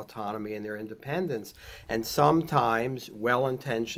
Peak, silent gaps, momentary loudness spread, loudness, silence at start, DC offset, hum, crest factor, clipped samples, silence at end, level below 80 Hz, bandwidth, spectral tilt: -8 dBFS; none; 13 LU; -29 LUFS; 0 s; under 0.1%; none; 22 dB; under 0.1%; 0 s; -58 dBFS; 17 kHz; -5.5 dB/octave